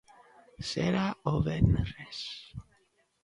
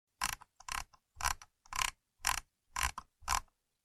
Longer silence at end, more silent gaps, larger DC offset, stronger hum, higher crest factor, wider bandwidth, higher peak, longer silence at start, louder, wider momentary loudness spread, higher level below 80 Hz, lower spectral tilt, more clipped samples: first, 0.6 s vs 0.45 s; neither; neither; neither; second, 22 dB vs 28 dB; second, 11.5 kHz vs 16 kHz; about the same, -10 dBFS vs -12 dBFS; first, 0.6 s vs 0.2 s; first, -31 LUFS vs -38 LUFS; first, 16 LU vs 8 LU; first, -44 dBFS vs -52 dBFS; first, -6.5 dB/octave vs 0 dB/octave; neither